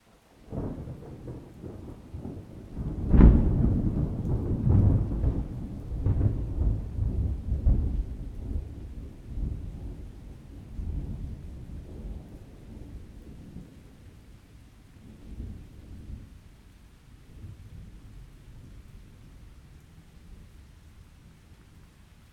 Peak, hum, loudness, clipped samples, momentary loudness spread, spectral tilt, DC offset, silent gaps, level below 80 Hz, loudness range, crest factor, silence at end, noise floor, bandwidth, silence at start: -2 dBFS; none; -29 LUFS; under 0.1%; 25 LU; -10 dB/octave; under 0.1%; none; -32 dBFS; 25 LU; 28 dB; 0.8 s; -55 dBFS; 4.7 kHz; 0.45 s